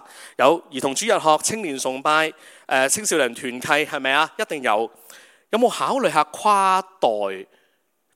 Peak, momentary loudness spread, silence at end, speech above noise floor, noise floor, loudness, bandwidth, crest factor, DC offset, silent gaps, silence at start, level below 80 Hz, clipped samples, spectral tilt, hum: 0 dBFS; 8 LU; 0.7 s; 47 dB; -68 dBFS; -20 LUFS; 16.5 kHz; 22 dB; under 0.1%; none; 0.1 s; -74 dBFS; under 0.1%; -2 dB/octave; none